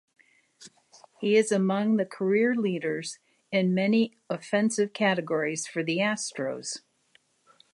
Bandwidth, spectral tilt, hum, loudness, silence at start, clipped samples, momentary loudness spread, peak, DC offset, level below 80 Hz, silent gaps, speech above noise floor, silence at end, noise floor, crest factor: 11.5 kHz; -5 dB/octave; none; -27 LUFS; 0.6 s; under 0.1%; 10 LU; -10 dBFS; under 0.1%; -80 dBFS; none; 40 dB; 0.95 s; -66 dBFS; 18 dB